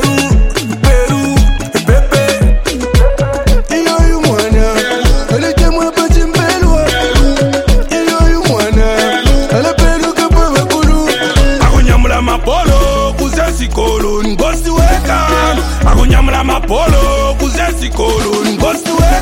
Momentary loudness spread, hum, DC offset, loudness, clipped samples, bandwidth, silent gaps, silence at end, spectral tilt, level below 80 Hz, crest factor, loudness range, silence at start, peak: 3 LU; none; under 0.1%; -11 LUFS; under 0.1%; 16.5 kHz; none; 0 s; -5 dB/octave; -12 dBFS; 10 dB; 1 LU; 0 s; 0 dBFS